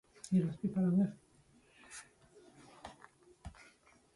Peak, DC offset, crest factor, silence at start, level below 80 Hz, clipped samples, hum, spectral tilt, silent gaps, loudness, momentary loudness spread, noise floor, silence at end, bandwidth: -22 dBFS; under 0.1%; 18 dB; 0.25 s; -66 dBFS; under 0.1%; none; -7.5 dB/octave; none; -34 LUFS; 23 LU; -67 dBFS; 0.65 s; 11.5 kHz